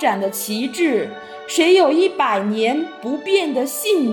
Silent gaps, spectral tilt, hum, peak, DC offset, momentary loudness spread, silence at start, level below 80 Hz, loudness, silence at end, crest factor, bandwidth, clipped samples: none; -3.5 dB/octave; none; -4 dBFS; under 0.1%; 11 LU; 0 s; -70 dBFS; -18 LUFS; 0 s; 14 dB; 17.5 kHz; under 0.1%